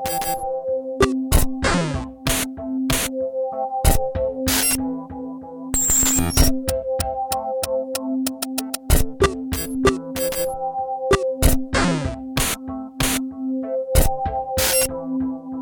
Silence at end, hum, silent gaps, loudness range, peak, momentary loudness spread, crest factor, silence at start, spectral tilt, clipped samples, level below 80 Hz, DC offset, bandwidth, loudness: 0 s; none; none; 3 LU; -2 dBFS; 9 LU; 20 dB; 0 s; -3.5 dB/octave; under 0.1%; -28 dBFS; under 0.1%; over 20 kHz; -21 LUFS